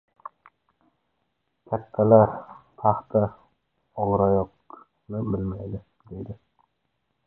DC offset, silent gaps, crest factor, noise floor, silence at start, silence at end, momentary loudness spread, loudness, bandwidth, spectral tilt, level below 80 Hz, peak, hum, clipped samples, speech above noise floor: under 0.1%; none; 24 dB; -76 dBFS; 1.7 s; 0.9 s; 24 LU; -24 LUFS; 2.6 kHz; -13.5 dB/octave; -50 dBFS; -4 dBFS; none; under 0.1%; 53 dB